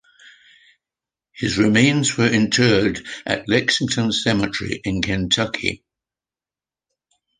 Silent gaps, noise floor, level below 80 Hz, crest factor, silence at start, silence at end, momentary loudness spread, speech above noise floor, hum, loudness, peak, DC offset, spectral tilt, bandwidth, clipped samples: none; under -90 dBFS; -46 dBFS; 20 dB; 1.35 s; 1.65 s; 9 LU; over 71 dB; none; -19 LUFS; -2 dBFS; under 0.1%; -4 dB/octave; 10 kHz; under 0.1%